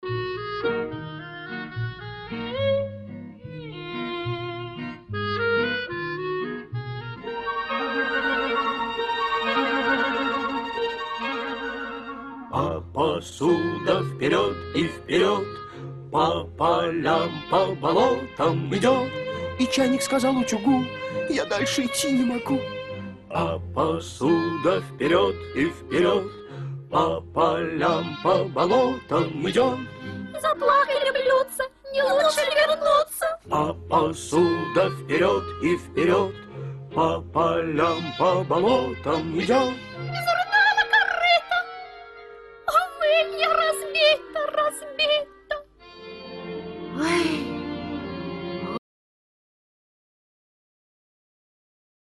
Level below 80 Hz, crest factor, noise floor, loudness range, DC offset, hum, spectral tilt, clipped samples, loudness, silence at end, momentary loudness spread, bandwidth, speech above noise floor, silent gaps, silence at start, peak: -54 dBFS; 18 dB; -44 dBFS; 8 LU; under 0.1%; none; -4.5 dB/octave; under 0.1%; -24 LUFS; 3.25 s; 14 LU; 12.5 kHz; 22 dB; none; 0 s; -6 dBFS